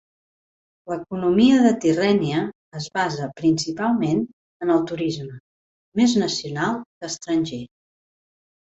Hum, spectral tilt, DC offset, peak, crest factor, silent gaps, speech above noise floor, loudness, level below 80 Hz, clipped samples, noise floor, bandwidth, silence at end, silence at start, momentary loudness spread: none; -5.5 dB/octave; under 0.1%; -6 dBFS; 18 dB; 2.55-2.72 s, 4.33-4.60 s, 5.40-5.92 s, 6.86-7.01 s; over 69 dB; -22 LUFS; -58 dBFS; under 0.1%; under -90 dBFS; 8 kHz; 1.1 s; 0.85 s; 15 LU